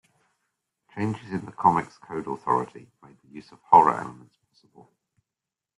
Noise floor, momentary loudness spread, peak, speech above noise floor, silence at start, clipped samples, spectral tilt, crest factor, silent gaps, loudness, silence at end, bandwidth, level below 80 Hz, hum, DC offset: -88 dBFS; 28 LU; -2 dBFS; 63 dB; 0.95 s; under 0.1%; -7.5 dB/octave; 24 dB; none; -24 LUFS; 1.65 s; 11 kHz; -66 dBFS; none; under 0.1%